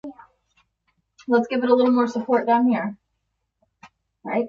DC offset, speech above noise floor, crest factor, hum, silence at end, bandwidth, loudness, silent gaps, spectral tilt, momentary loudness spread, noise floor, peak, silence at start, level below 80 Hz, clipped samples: under 0.1%; 56 dB; 18 dB; none; 0 s; 7 kHz; -21 LUFS; none; -6.5 dB/octave; 20 LU; -76 dBFS; -6 dBFS; 0.05 s; -68 dBFS; under 0.1%